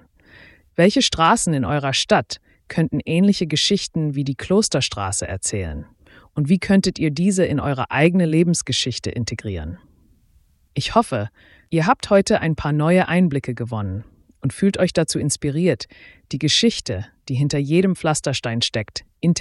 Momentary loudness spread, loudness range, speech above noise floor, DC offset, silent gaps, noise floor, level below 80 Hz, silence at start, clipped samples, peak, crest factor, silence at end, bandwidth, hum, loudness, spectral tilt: 12 LU; 3 LU; 38 dB; under 0.1%; none; -57 dBFS; -44 dBFS; 0.8 s; under 0.1%; -2 dBFS; 18 dB; 0 s; 12 kHz; none; -20 LUFS; -5 dB/octave